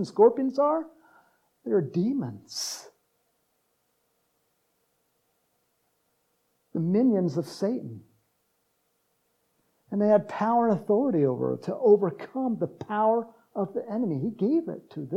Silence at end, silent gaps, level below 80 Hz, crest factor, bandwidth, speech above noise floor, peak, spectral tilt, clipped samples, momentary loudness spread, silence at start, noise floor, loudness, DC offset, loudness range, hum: 0 s; none; -80 dBFS; 20 dB; 14 kHz; 48 dB; -8 dBFS; -7 dB/octave; under 0.1%; 13 LU; 0 s; -74 dBFS; -26 LUFS; under 0.1%; 10 LU; none